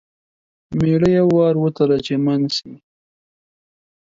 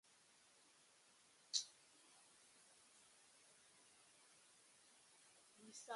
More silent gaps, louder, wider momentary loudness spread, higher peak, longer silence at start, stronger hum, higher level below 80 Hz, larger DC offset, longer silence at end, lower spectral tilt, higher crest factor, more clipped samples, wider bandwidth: neither; first, -17 LUFS vs -48 LUFS; second, 8 LU vs 25 LU; first, -4 dBFS vs -24 dBFS; first, 0.7 s vs 0.05 s; neither; first, -50 dBFS vs under -90 dBFS; neither; first, 1.3 s vs 0 s; first, -7.5 dB/octave vs 1.5 dB/octave; second, 14 dB vs 36 dB; neither; second, 7.8 kHz vs 11.5 kHz